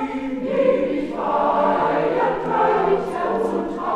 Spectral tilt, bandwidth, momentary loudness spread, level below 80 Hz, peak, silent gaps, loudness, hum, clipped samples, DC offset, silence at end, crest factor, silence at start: -7 dB/octave; 10.5 kHz; 6 LU; -50 dBFS; -6 dBFS; none; -20 LUFS; none; under 0.1%; under 0.1%; 0 s; 14 dB; 0 s